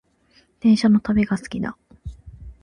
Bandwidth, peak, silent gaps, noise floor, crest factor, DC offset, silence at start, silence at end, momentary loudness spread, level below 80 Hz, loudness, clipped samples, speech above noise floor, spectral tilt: 10.5 kHz; -8 dBFS; none; -59 dBFS; 14 dB; under 0.1%; 0.65 s; 0.1 s; 23 LU; -44 dBFS; -20 LUFS; under 0.1%; 41 dB; -6.5 dB/octave